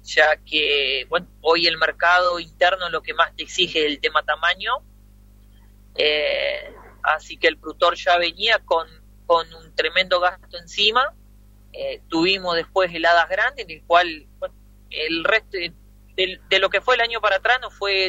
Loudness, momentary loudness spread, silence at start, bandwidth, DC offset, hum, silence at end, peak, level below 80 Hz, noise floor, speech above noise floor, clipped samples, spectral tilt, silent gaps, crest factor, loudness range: -20 LUFS; 13 LU; 0.05 s; 16 kHz; under 0.1%; 50 Hz at -50 dBFS; 0 s; -2 dBFS; -48 dBFS; -49 dBFS; 28 dB; under 0.1%; -2.5 dB/octave; none; 20 dB; 3 LU